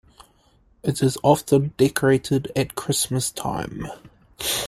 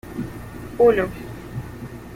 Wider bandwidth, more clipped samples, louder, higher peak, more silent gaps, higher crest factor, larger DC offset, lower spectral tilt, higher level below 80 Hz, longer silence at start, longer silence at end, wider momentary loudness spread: about the same, 16 kHz vs 16 kHz; neither; about the same, -22 LUFS vs -20 LUFS; about the same, -2 dBFS vs -4 dBFS; neither; about the same, 20 dB vs 20 dB; neither; second, -4.5 dB/octave vs -7 dB/octave; second, -50 dBFS vs -44 dBFS; first, 0.85 s vs 0.05 s; about the same, 0 s vs 0 s; second, 11 LU vs 19 LU